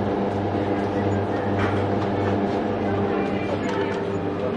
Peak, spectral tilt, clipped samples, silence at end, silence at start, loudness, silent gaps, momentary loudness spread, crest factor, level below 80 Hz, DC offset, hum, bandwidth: -12 dBFS; -8 dB/octave; under 0.1%; 0 s; 0 s; -24 LUFS; none; 2 LU; 12 dB; -48 dBFS; under 0.1%; none; 9.8 kHz